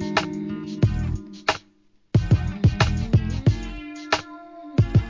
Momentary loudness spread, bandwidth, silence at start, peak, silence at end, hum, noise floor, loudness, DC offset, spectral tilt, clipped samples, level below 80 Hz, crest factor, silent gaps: 11 LU; 7.6 kHz; 0 s; -2 dBFS; 0 s; none; -60 dBFS; -24 LUFS; under 0.1%; -6.5 dB/octave; under 0.1%; -32 dBFS; 20 dB; none